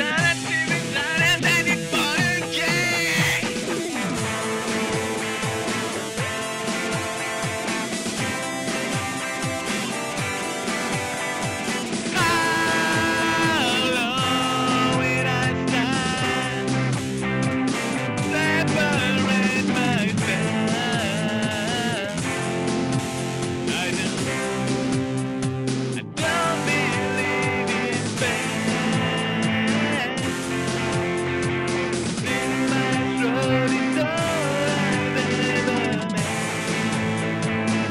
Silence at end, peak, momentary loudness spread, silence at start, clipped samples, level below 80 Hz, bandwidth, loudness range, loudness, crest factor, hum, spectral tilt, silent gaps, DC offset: 0 s; -8 dBFS; 6 LU; 0 s; under 0.1%; -52 dBFS; 16 kHz; 5 LU; -22 LUFS; 16 dB; none; -4 dB/octave; none; under 0.1%